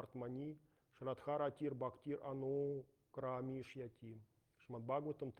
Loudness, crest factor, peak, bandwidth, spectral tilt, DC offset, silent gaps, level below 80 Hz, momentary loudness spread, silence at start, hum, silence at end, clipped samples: -46 LUFS; 18 dB; -28 dBFS; 9.8 kHz; -9 dB/octave; under 0.1%; none; -80 dBFS; 13 LU; 0 s; none; 0.1 s; under 0.1%